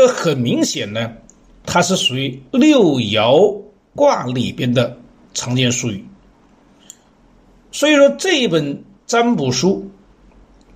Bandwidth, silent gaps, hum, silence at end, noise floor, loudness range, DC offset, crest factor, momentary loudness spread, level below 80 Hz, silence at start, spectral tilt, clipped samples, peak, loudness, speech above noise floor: 15.5 kHz; none; none; 0.85 s; -51 dBFS; 6 LU; under 0.1%; 16 dB; 15 LU; -52 dBFS; 0 s; -4.5 dB/octave; under 0.1%; 0 dBFS; -16 LUFS; 35 dB